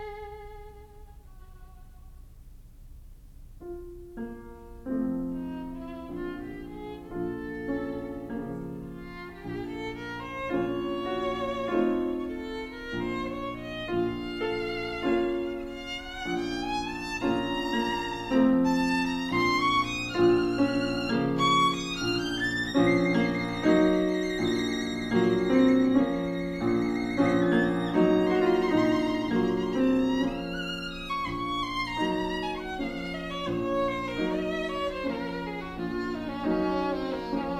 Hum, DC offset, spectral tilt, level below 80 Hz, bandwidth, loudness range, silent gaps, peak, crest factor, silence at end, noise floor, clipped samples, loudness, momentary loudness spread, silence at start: none; under 0.1%; -6 dB/octave; -48 dBFS; 14 kHz; 11 LU; none; -12 dBFS; 16 dB; 0 s; -48 dBFS; under 0.1%; -28 LUFS; 15 LU; 0 s